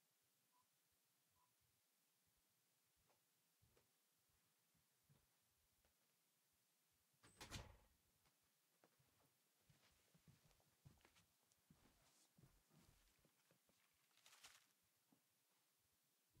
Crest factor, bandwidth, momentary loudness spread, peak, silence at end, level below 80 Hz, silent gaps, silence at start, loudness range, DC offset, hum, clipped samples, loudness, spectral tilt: 32 dB; 15.5 kHz; 10 LU; -42 dBFS; 0 s; -82 dBFS; none; 0 s; 0 LU; under 0.1%; none; under 0.1%; -62 LUFS; -3 dB/octave